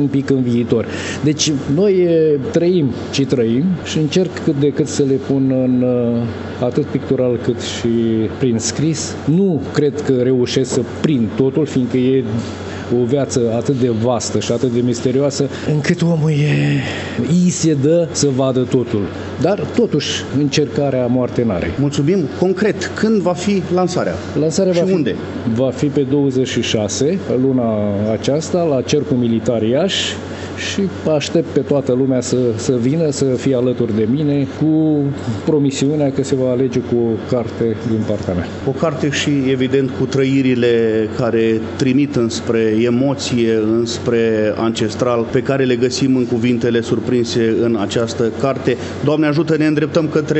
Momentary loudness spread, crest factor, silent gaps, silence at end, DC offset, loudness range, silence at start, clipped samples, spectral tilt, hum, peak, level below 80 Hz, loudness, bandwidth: 4 LU; 14 dB; none; 0 s; under 0.1%; 2 LU; 0 s; under 0.1%; -6 dB/octave; none; 0 dBFS; -52 dBFS; -16 LUFS; 8.4 kHz